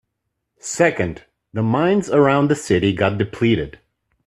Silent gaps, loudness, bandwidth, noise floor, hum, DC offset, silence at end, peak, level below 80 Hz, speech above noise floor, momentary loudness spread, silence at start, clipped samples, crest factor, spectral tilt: none; -18 LUFS; 13.5 kHz; -76 dBFS; none; under 0.1%; 0.55 s; -2 dBFS; -50 dBFS; 59 dB; 15 LU; 0.65 s; under 0.1%; 18 dB; -6 dB/octave